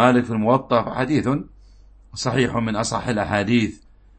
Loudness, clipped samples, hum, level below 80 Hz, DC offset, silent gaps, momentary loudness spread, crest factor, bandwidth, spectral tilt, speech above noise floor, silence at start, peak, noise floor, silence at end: -21 LUFS; under 0.1%; none; -46 dBFS; under 0.1%; none; 9 LU; 18 dB; 8.8 kHz; -5.5 dB/octave; 28 dB; 0 s; -2 dBFS; -48 dBFS; 0.45 s